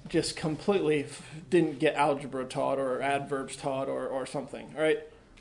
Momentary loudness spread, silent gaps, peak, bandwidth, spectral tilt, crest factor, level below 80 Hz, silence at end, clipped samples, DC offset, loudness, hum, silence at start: 9 LU; none; -12 dBFS; 11 kHz; -5 dB/octave; 18 dB; -60 dBFS; 0 s; under 0.1%; under 0.1%; -30 LUFS; none; 0 s